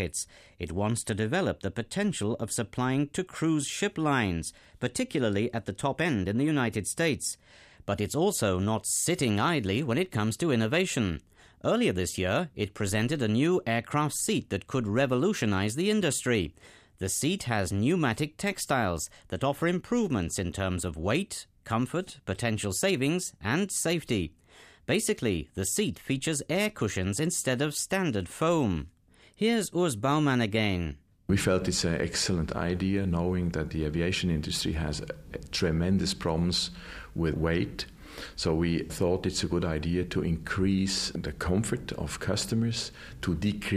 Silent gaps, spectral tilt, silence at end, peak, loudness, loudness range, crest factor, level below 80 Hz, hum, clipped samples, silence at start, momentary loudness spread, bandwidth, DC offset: none; -4.5 dB/octave; 0 s; -12 dBFS; -29 LUFS; 2 LU; 18 dB; -48 dBFS; none; under 0.1%; 0 s; 8 LU; 15.5 kHz; under 0.1%